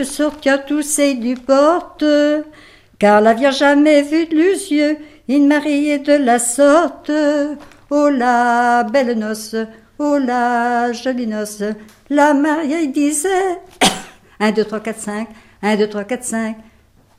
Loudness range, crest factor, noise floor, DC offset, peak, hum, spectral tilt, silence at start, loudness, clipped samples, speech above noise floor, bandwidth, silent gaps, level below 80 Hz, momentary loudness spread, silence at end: 5 LU; 16 dB; -51 dBFS; under 0.1%; 0 dBFS; none; -3.5 dB/octave; 0 s; -16 LUFS; under 0.1%; 36 dB; 15.5 kHz; none; -52 dBFS; 12 LU; 0.55 s